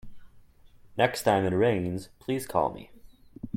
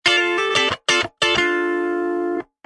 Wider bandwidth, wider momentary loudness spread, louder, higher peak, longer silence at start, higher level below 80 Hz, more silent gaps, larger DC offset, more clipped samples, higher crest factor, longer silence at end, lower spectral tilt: first, 16.5 kHz vs 11.5 kHz; first, 15 LU vs 6 LU; second, -27 LUFS vs -19 LUFS; second, -8 dBFS vs -4 dBFS; about the same, 0.05 s vs 0.05 s; about the same, -56 dBFS vs -56 dBFS; neither; neither; neither; first, 22 dB vs 16 dB; second, 0.05 s vs 0.2 s; first, -5.5 dB/octave vs -2 dB/octave